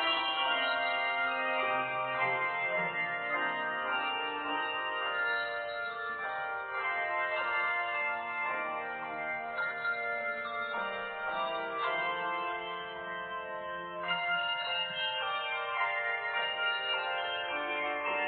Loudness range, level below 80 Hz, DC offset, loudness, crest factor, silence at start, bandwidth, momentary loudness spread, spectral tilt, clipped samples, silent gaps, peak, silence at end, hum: 4 LU; -74 dBFS; under 0.1%; -33 LUFS; 16 dB; 0 s; 4.6 kHz; 6 LU; 1.5 dB/octave; under 0.1%; none; -18 dBFS; 0 s; none